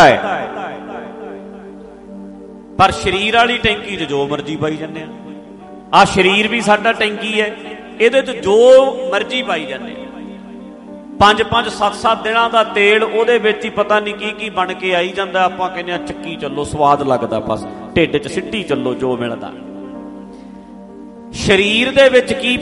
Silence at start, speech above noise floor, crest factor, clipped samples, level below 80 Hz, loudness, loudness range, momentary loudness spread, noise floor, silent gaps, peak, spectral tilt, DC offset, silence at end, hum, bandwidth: 0 s; 20 dB; 16 dB; under 0.1%; -44 dBFS; -14 LUFS; 6 LU; 23 LU; -35 dBFS; none; 0 dBFS; -4.5 dB/octave; under 0.1%; 0 s; none; 11.5 kHz